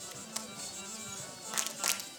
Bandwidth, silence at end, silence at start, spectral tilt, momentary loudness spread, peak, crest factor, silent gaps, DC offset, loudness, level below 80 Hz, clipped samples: 19.5 kHz; 0 s; 0 s; -0.5 dB/octave; 9 LU; -6 dBFS; 34 dB; none; under 0.1%; -36 LUFS; -74 dBFS; under 0.1%